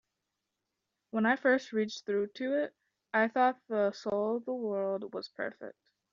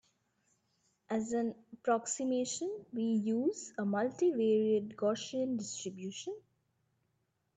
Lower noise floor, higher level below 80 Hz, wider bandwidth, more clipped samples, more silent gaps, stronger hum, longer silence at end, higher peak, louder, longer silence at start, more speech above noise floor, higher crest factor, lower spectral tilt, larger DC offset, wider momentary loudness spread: first, -86 dBFS vs -80 dBFS; about the same, -80 dBFS vs -80 dBFS; second, 7.4 kHz vs 9.4 kHz; neither; neither; neither; second, 0.45 s vs 1.15 s; first, -14 dBFS vs -20 dBFS; first, -32 LUFS vs -35 LUFS; about the same, 1.15 s vs 1.1 s; first, 55 dB vs 46 dB; about the same, 20 dB vs 16 dB; about the same, -3.5 dB/octave vs -4.5 dB/octave; neither; about the same, 12 LU vs 11 LU